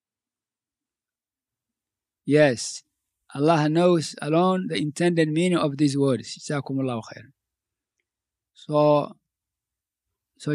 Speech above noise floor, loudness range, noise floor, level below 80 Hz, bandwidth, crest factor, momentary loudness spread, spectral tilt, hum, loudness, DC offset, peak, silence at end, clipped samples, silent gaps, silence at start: over 68 dB; 6 LU; under -90 dBFS; -74 dBFS; 11.5 kHz; 20 dB; 15 LU; -6 dB/octave; none; -23 LUFS; under 0.1%; -4 dBFS; 0 s; under 0.1%; none; 2.25 s